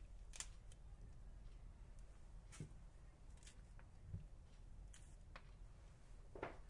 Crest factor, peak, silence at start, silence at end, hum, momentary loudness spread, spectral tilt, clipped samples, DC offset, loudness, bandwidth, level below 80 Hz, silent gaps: 28 dB; -30 dBFS; 0 s; 0 s; none; 10 LU; -4 dB/octave; under 0.1%; under 0.1%; -60 LUFS; 11 kHz; -60 dBFS; none